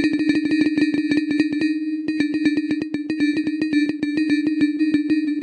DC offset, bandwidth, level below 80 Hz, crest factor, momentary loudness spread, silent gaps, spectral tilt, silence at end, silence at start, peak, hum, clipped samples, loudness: under 0.1%; 9.6 kHz; -62 dBFS; 14 dB; 4 LU; none; -5.5 dB/octave; 0 s; 0 s; -6 dBFS; none; under 0.1%; -21 LUFS